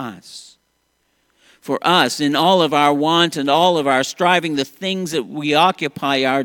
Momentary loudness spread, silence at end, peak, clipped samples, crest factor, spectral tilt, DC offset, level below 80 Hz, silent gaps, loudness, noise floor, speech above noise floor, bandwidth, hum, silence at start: 11 LU; 0 s; 0 dBFS; under 0.1%; 18 dB; -4 dB/octave; under 0.1%; -64 dBFS; none; -16 LUFS; -66 dBFS; 49 dB; 17.5 kHz; none; 0 s